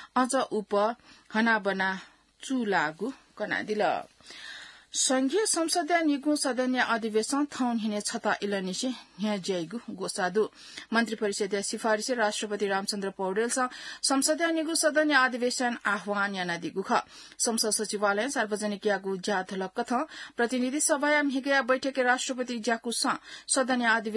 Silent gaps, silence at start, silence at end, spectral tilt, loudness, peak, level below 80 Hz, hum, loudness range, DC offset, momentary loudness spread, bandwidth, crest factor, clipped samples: none; 0 s; 0 s; -2.5 dB/octave; -28 LUFS; -10 dBFS; -74 dBFS; none; 4 LU; under 0.1%; 9 LU; 12 kHz; 20 dB; under 0.1%